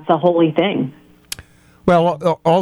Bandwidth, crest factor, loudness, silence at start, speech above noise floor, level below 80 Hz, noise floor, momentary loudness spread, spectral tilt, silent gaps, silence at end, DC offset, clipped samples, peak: 15 kHz; 14 dB; -16 LUFS; 0.05 s; 29 dB; -50 dBFS; -44 dBFS; 17 LU; -6.5 dB/octave; none; 0 s; under 0.1%; under 0.1%; -2 dBFS